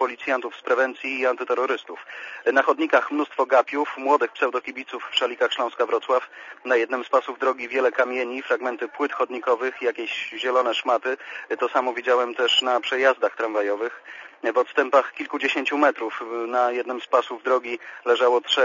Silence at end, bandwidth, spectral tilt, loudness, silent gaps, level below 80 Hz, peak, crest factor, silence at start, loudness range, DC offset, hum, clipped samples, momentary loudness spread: 0 s; 7.4 kHz; -1.5 dB/octave; -23 LUFS; none; -74 dBFS; -4 dBFS; 20 dB; 0 s; 2 LU; under 0.1%; none; under 0.1%; 10 LU